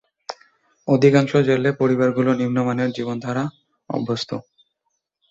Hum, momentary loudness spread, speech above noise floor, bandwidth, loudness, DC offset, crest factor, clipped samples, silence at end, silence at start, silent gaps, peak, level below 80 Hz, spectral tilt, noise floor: none; 19 LU; 57 dB; 7.8 kHz; -20 LUFS; under 0.1%; 18 dB; under 0.1%; 0.9 s; 0.3 s; none; -2 dBFS; -62 dBFS; -7 dB/octave; -75 dBFS